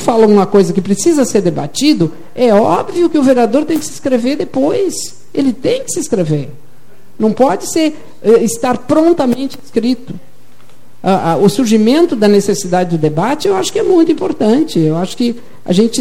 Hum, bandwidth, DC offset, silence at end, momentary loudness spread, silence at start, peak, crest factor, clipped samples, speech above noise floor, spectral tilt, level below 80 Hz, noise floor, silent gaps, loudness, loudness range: none; 16.5 kHz; 5%; 0 s; 8 LU; 0 s; 0 dBFS; 12 dB; under 0.1%; 34 dB; -5.5 dB/octave; -52 dBFS; -46 dBFS; none; -13 LUFS; 4 LU